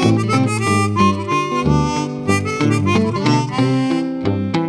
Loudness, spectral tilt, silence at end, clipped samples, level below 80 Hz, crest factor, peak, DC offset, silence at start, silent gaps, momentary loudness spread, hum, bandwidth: -17 LUFS; -6 dB/octave; 0 s; under 0.1%; -40 dBFS; 16 dB; -2 dBFS; under 0.1%; 0 s; none; 4 LU; none; 11 kHz